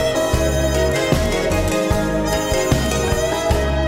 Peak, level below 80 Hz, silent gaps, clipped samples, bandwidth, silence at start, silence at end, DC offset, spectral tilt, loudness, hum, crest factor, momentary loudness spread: 0 dBFS; -26 dBFS; none; under 0.1%; 16 kHz; 0 s; 0 s; 0.3%; -5 dB/octave; -18 LUFS; none; 18 dB; 1 LU